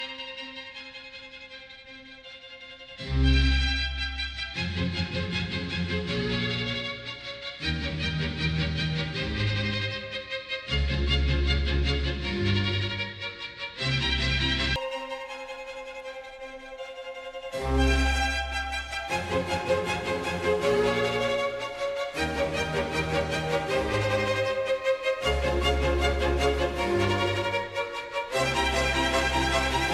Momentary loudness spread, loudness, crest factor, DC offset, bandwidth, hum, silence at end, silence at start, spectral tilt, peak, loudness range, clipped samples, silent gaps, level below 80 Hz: 14 LU; -27 LUFS; 16 dB; under 0.1%; 13 kHz; none; 0 s; 0 s; -5 dB/octave; -12 dBFS; 4 LU; under 0.1%; none; -34 dBFS